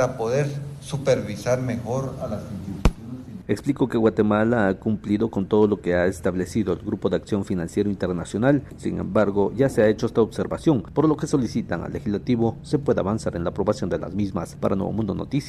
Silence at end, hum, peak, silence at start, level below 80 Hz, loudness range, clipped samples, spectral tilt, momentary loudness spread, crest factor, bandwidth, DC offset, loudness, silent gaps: 0 s; none; -6 dBFS; 0 s; -40 dBFS; 3 LU; under 0.1%; -7 dB/octave; 8 LU; 16 dB; 13 kHz; under 0.1%; -23 LUFS; none